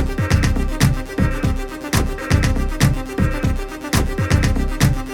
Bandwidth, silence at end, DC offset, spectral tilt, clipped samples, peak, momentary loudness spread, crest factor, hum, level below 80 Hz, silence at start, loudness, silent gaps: 18.5 kHz; 0 s; under 0.1%; -5.5 dB/octave; under 0.1%; -2 dBFS; 5 LU; 16 dB; none; -22 dBFS; 0 s; -19 LUFS; none